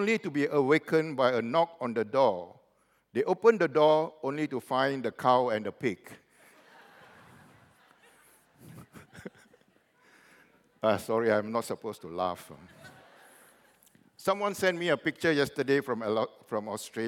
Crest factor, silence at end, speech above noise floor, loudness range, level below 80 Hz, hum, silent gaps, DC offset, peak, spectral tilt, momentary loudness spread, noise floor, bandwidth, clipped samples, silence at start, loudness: 20 dB; 0 s; 41 dB; 9 LU; -76 dBFS; none; none; under 0.1%; -10 dBFS; -5.5 dB/octave; 14 LU; -69 dBFS; 17 kHz; under 0.1%; 0 s; -29 LUFS